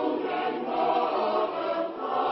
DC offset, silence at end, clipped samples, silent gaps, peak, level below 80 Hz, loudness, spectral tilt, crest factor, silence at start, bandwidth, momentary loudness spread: under 0.1%; 0 s; under 0.1%; none; -14 dBFS; -72 dBFS; -28 LUFS; -2 dB/octave; 14 dB; 0 s; 5.6 kHz; 4 LU